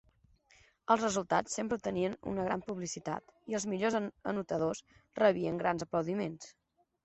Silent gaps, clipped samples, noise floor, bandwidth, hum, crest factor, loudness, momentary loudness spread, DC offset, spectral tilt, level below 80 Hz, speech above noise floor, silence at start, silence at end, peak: none; under 0.1%; -67 dBFS; 8.2 kHz; none; 22 dB; -34 LUFS; 11 LU; under 0.1%; -5 dB/octave; -66 dBFS; 33 dB; 0.9 s; 0.55 s; -12 dBFS